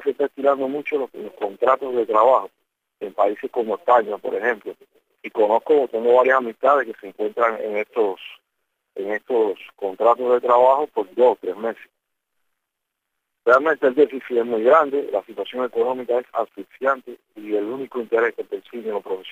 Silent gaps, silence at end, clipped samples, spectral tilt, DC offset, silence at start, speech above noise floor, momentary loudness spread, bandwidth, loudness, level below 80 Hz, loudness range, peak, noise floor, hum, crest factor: none; 0 s; under 0.1%; -5.5 dB/octave; under 0.1%; 0 s; 60 dB; 14 LU; 15 kHz; -20 LUFS; -78 dBFS; 5 LU; -2 dBFS; -80 dBFS; none; 18 dB